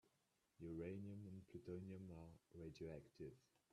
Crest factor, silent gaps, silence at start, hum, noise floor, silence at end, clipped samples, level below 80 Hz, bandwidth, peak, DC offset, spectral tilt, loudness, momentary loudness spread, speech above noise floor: 18 dB; none; 0.05 s; none; -86 dBFS; 0.35 s; under 0.1%; -76 dBFS; 12.5 kHz; -38 dBFS; under 0.1%; -8 dB/octave; -57 LUFS; 8 LU; 30 dB